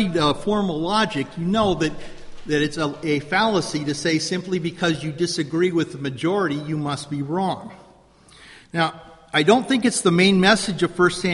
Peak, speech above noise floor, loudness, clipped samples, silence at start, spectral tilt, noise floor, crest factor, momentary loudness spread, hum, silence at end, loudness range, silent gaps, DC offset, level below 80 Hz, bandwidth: -2 dBFS; 30 dB; -21 LUFS; under 0.1%; 0 s; -4.5 dB/octave; -51 dBFS; 18 dB; 9 LU; none; 0 s; 6 LU; none; under 0.1%; -48 dBFS; 11.5 kHz